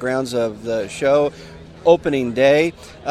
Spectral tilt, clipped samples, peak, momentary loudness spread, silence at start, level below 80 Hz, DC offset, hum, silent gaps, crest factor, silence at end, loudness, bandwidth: -5.5 dB/octave; under 0.1%; 0 dBFS; 9 LU; 0 s; -48 dBFS; under 0.1%; none; none; 18 dB; 0 s; -18 LUFS; 14 kHz